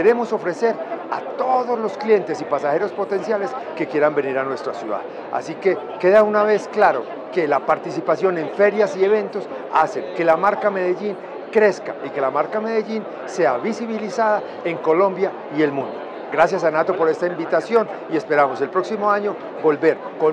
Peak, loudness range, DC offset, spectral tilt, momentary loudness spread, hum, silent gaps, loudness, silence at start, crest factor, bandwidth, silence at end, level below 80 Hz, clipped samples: 0 dBFS; 3 LU; under 0.1%; -6 dB/octave; 10 LU; none; none; -20 LUFS; 0 s; 20 dB; 9.2 kHz; 0 s; -68 dBFS; under 0.1%